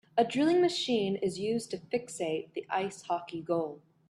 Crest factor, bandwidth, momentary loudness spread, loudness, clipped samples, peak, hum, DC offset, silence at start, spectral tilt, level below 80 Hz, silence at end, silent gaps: 18 dB; 12.5 kHz; 9 LU; -31 LUFS; under 0.1%; -14 dBFS; none; under 0.1%; 0.15 s; -5 dB/octave; -72 dBFS; 0.3 s; none